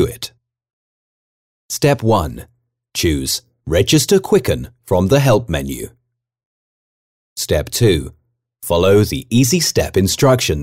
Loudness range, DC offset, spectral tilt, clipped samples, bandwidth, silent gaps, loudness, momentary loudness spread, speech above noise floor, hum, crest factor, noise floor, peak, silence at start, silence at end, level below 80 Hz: 5 LU; under 0.1%; -5 dB/octave; under 0.1%; 16.5 kHz; 0.73-1.69 s, 6.45-7.36 s; -16 LUFS; 15 LU; over 75 dB; none; 14 dB; under -90 dBFS; -4 dBFS; 0 s; 0 s; -34 dBFS